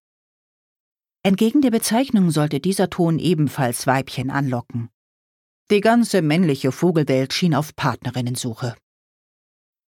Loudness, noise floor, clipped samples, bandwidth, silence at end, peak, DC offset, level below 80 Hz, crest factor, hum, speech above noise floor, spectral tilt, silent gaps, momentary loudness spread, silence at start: -20 LUFS; under -90 dBFS; under 0.1%; 18 kHz; 1.15 s; -4 dBFS; under 0.1%; -58 dBFS; 18 dB; none; over 71 dB; -5.5 dB/octave; 4.94-5.66 s; 9 LU; 1.25 s